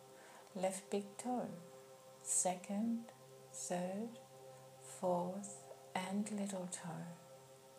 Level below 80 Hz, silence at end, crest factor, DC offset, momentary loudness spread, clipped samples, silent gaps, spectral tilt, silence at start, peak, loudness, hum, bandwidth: under -90 dBFS; 0 s; 20 dB; under 0.1%; 19 LU; under 0.1%; none; -4 dB/octave; 0 s; -24 dBFS; -42 LUFS; none; 15.5 kHz